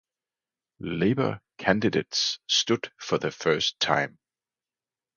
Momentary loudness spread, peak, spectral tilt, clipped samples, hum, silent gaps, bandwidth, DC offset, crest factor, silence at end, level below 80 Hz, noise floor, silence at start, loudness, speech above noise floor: 7 LU; -4 dBFS; -3.5 dB/octave; under 0.1%; none; none; 10 kHz; under 0.1%; 24 dB; 1.1 s; -60 dBFS; under -90 dBFS; 0.8 s; -26 LUFS; over 64 dB